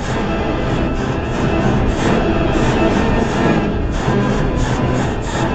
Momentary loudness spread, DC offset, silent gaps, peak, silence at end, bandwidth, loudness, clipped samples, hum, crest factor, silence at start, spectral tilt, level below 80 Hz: 4 LU; under 0.1%; none; -2 dBFS; 0 s; 9 kHz; -17 LUFS; under 0.1%; none; 14 dB; 0 s; -6.5 dB/octave; -24 dBFS